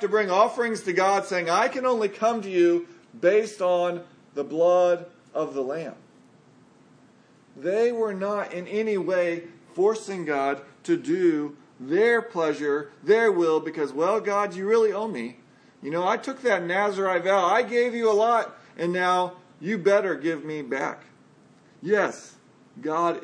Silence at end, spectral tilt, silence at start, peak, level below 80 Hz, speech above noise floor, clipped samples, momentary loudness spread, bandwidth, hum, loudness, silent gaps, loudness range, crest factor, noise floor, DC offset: 0 s; -5 dB/octave; 0 s; -6 dBFS; -82 dBFS; 32 dB; under 0.1%; 12 LU; 10.5 kHz; none; -24 LUFS; none; 5 LU; 18 dB; -56 dBFS; under 0.1%